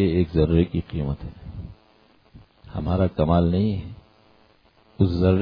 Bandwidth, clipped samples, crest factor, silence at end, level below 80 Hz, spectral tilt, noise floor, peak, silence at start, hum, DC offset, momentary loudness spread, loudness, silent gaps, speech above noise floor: 5.2 kHz; under 0.1%; 16 dB; 0 s; -36 dBFS; -11 dB/octave; -58 dBFS; -6 dBFS; 0 s; none; under 0.1%; 19 LU; -23 LUFS; none; 37 dB